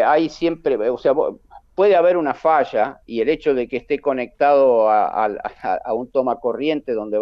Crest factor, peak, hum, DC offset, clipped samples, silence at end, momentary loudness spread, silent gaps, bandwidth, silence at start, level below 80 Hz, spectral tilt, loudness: 14 dB; -4 dBFS; none; under 0.1%; under 0.1%; 0 s; 9 LU; none; 6.8 kHz; 0 s; -54 dBFS; -6.5 dB/octave; -19 LUFS